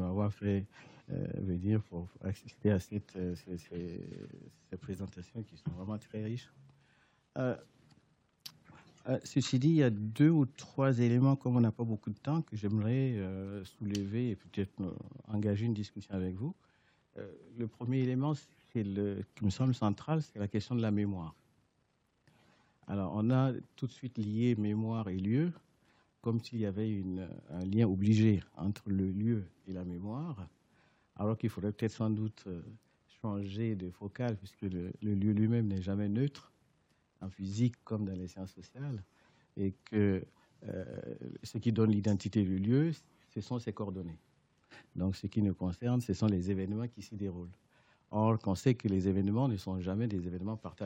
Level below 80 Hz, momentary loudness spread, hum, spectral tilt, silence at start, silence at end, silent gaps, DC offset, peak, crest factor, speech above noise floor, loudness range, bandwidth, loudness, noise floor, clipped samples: -70 dBFS; 15 LU; none; -8 dB/octave; 0 s; 0 s; none; under 0.1%; -16 dBFS; 20 dB; 42 dB; 7 LU; 10 kHz; -35 LUFS; -76 dBFS; under 0.1%